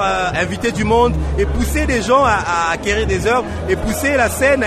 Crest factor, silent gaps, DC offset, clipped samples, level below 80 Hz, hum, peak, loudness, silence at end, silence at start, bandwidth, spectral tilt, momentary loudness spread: 14 dB; none; under 0.1%; under 0.1%; -26 dBFS; none; -2 dBFS; -16 LUFS; 0 s; 0 s; 13.5 kHz; -5 dB/octave; 5 LU